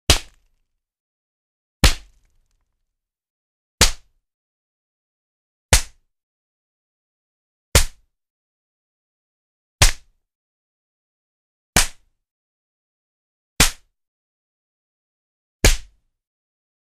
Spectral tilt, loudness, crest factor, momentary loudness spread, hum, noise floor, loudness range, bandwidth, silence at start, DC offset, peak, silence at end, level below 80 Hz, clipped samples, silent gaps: -2 dB/octave; -19 LUFS; 24 dB; 12 LU; none; -79 dBFS; 4 LU; 15.5 kHz; 0.1 s; under 0.1%; 0 dBFS; 1.15 s; -28 dBFS; under 0.1%; 1.00-1.80 s, 3.30-3.78 s, 4.34-5.69 s, 6.23-7.72 s, 8.30-9.79 s, 10.35-11.73 s, 12.31-13.56 s, 14.08-15.60 s